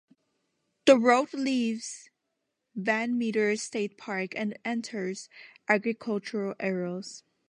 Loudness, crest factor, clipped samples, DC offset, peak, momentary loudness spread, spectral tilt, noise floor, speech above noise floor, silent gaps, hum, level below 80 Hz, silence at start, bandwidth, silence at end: -28 LUFS; 24 dB; under 0.1%; under 0.1%; -6 dBFS; 18 LU; -4.5 dB/octave; -82 dBFS; 53 dB; none; none; -82 dBFS; 0.85 s; 11 kHz; 0.35 s